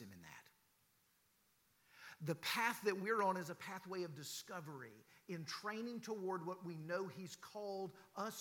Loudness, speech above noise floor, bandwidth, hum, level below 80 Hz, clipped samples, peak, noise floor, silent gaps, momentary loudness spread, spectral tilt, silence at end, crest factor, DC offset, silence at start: -44 LUFS; 33 dB; 17.5 kHz; none; under -90 dBFS; under 0.1%; -24 dBFS; -77 dBFS; none; 19 LU; -4 dB/octave; 0 s; 22 dB; under 0.1%; 0 s